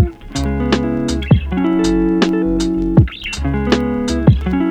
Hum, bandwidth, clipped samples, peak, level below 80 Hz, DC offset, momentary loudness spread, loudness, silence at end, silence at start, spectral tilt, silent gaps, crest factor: none; 10.5 kHz; under 0.1%; 0 dBFS; -24 dBFS; under 0.1%; 5 LU; -16 LUFS; 0 s; 0 s; -6.5 dB/octave; none; 14 dB